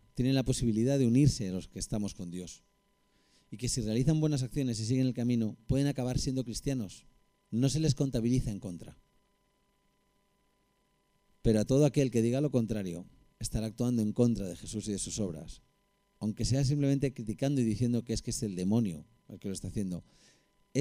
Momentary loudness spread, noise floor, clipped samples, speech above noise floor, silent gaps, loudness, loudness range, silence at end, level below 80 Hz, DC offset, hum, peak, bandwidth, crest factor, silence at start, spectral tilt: 14 LU; -73 dBFS; under 0.1%; 43 dB; none; -31 LUFS; 3 LU; 0 s; -48 dBFS; under 0.1%; none; -14 dBFS; 15.5 kHz; 18 dB; 0.15 s; -6.5 dB/octave